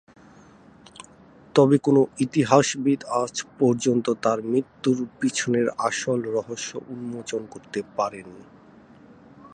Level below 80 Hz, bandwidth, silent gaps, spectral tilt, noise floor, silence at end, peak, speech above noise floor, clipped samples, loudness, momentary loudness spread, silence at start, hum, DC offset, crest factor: -66 dBFS; 9.8 kHz; none; -5 dB/octave; -51 dBFS; 0.05 s; -2 dBFS; 28 dB; under 0.1%; -23 LUFS; 14 LU; 1.55 s; none; under 0.1%; 22 dB